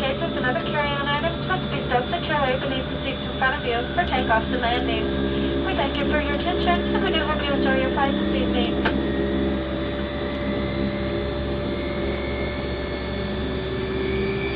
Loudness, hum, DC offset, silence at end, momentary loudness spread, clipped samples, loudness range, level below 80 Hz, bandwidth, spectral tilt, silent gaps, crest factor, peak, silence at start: -24 LUFS; none; under 0.1%; 0 s; 6 LU; under 0.1%; 4 LU; -34 dBFS; 5.2 kHz; -8.5 dB/octave; none; 16 dB; -6 dBFS; 0 s